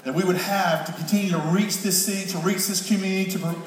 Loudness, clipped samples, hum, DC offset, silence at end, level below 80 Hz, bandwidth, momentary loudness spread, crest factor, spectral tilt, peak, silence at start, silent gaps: -23 LUFS; under 0.1%; none; under 0.1%; 0 s; -76 dBFS; 16.5 kHz; 4 LU; 16 dB; -4 dB/octave; -8 dBFS; 0.05 s; none